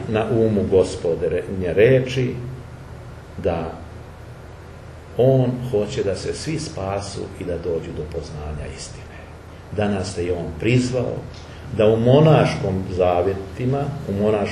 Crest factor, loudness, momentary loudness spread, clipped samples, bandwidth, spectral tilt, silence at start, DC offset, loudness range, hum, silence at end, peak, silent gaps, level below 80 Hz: 20 dB; -21 LUFS; 22 LU; under 0.1%; 12 kHz; -7 dB/octave; 0 s; under 0.1%; 9 LU; none; 0 s; 0 dBFS; none; -42 dBFS